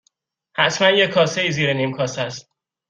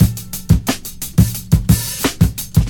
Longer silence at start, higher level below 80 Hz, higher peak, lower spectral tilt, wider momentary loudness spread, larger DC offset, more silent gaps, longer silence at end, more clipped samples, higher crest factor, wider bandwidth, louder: first, 0.55 s vs 0 s; second, -60 dBFS vs -24 dBFS; about the same, -2 dBFS vs 0 dBFS; second, -4 dB/octave vs -5.5 dB/octave; first, 13 LU vs 7 LU; neither; neither; first, 0.5 s vs 0 s; neither; about the same, 18 dB vs 16 dB; second, 9.2 kHz vs 18.5 kHz; about the same, -18 LUFS vs -17 LUFS